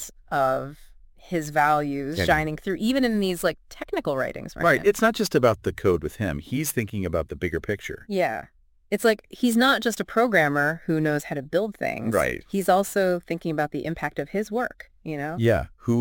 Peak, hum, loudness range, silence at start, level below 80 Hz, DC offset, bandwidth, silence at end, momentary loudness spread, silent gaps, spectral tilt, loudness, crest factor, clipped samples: -4 dBFS; none; 4 LU; 0 s; -46 dBFS; under 0.1%; 17 kHz; 0 s; 10 LU; none; -5 dB/octave; -24 LUFS; 20 dB; under 0.1%